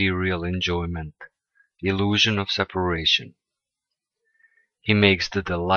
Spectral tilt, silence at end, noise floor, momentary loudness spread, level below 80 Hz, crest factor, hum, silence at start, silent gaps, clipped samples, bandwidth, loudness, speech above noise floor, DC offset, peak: -5 dB/octave; 0 s; -86 dBFS; 12 LU; -46 dBFS; 20 dB; none; 0 s; none; under 0.1%; 7 kHz; -22 LUFS; 63 dB; under 0.1%; -4 dBFS